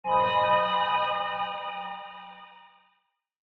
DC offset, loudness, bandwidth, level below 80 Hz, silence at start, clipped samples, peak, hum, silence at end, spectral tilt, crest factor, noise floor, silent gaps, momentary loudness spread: under 0.1%; -26 LUFS; 6 kHz; -64 dBFS; 0.05 s; under 0.1%; -10 dBFS; none; 0.95 s; -5.5 dB/octave; 18 dB; -74 dBFS; none; 21 LU